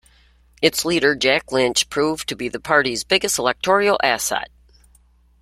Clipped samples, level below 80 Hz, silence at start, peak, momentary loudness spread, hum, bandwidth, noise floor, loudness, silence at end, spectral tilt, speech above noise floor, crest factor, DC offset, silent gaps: under 0.1%; -52 dBFS; 0.6 s; 0 dBFS; 8 LU; none; 16 kHz; -55 dBFS; -19 LUFS; 0.95 s; -2.5 dB/octave; 36 dB; 20 dB; under 0.1%; none